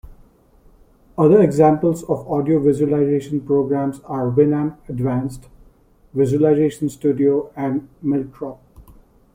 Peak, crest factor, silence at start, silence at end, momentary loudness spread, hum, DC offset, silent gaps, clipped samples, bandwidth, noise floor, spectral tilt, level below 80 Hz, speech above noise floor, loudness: -2 dBFS; 18 dB; 0.05 s; 0.55 s; 10 LU; none; under 0.1%; none; under 0.1%; 15.5 kHz; -52 dBFS; -9 dB/octave; -48 dBFS; 34 dB; -18 LUFS